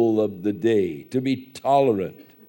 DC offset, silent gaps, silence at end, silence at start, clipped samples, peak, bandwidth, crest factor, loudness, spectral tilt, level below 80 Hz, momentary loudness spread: under 0.1%; none; 0.25 s; 0 s; under 0.1%; -6 dBFS; 16.5 kHz; 16 dB; -23 LUFS; -7.5 dB/octave; -66 dBFS; 8 LU